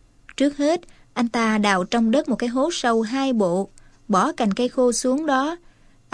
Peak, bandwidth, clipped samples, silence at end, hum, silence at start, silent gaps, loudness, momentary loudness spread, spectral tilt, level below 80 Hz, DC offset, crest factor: -2 dBFS; 13.5 kHz; under 0.1%; 0.55 s; none; 0.3 s; none; -21 LUFS; 7 LU; -4.5 dB/octave; -52 dBFS; under 0.1%; 18 dB